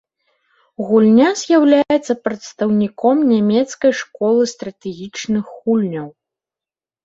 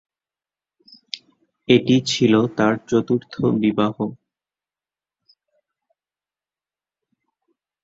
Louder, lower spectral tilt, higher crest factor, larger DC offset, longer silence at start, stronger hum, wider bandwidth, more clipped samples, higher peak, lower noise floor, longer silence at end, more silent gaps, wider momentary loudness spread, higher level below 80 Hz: first, -16 LUFS vs -19 LUFS; about the same, -5.5 dB/octave vs -6 dB/octave; second, 14 dB vs 22 dB; neither; second, 0.8 s vs 1.15 s; second, none vs 50 Hz at -60 dBFS; about the same, 7.8 kHz vs 8 kHz; neither; about the same, -2 dBFS vs -2 dBFS; about the same, under -90 dBFS vs under -90 dBFS; second, 0.95 s vs 3.7 s; neither; about the same, 16 LU vs 18 LU; about the same, -60 dBFS vs -60 dBFS